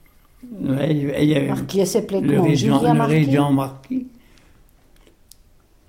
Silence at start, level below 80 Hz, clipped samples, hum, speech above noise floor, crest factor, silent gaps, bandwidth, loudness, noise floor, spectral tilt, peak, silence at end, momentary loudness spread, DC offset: 0.45 s; -50 dBFS; under 0.1%; none; 35 dB; 16 dB; none; 16.5 kHz; -19 LUFS; -53 dBFS; -6.5 dB/octave; -4 dBFS; 1.8 s; 12 LU; under 0.1%